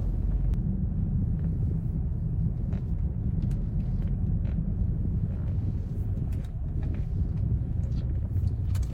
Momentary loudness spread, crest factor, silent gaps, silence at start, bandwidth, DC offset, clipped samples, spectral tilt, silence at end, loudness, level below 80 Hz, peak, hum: 3 LU; 12 dB; none; 0 s; 7.6 kHz; under 0.1%; under 0.1%; -10 dB/octave; 0 s; -30 LUFS; -32 dBFS; -16 dBFS; none